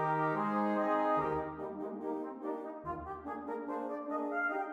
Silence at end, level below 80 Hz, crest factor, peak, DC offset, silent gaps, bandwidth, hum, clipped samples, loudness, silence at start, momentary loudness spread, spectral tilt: 0 s; -64 dBFS; 16 dB; -20 dBFS; under 0.1%; none; 8 kHz; none; under 0.1%; -36 LUFS; 0 s; 10 LU; -8.5 dB/octave